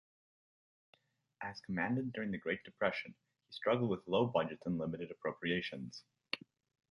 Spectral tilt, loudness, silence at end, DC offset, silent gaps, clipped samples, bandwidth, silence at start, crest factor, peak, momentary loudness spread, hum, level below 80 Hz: -7 dB/octave; -38 LUFS; 0.55 s; under 0.1%; none; under 0.1%; 11 kHz; 1.4 s; 22 dB; -18 dBFS; 13 LU; none; -72 dBFS